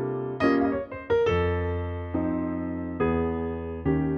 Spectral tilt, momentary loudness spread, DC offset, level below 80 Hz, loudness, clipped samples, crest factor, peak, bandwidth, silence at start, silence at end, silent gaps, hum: -9 dB/octave; 8 LU; under 0.1%; -42 dBFS; -27 LUFS; under 0.1%; 16 dB; -10 dBFS; 6.6 kHz; 0 s; 0 s; none; none